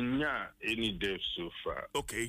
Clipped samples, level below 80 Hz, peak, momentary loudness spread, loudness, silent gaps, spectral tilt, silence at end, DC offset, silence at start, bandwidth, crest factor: under 0.1%; -54 dBFS; -22 dBFS; 6 LU; -35 LUFS; none; -3.5 dB/octave; 0 s; under 0.1%; 0 s; 15.5 kHz; 14 dB